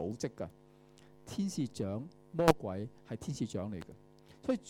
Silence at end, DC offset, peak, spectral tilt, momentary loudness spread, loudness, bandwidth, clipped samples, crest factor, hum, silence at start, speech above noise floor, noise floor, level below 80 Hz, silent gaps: 0 s; under 0.1%; -8 dBFS; -6 dB/octave; 17 LU; -37 LUFS; 17 kHz; under 0.1%; 30 dB; none; 0 s; 24 dB; -60 dBFS; -60 dBFS; none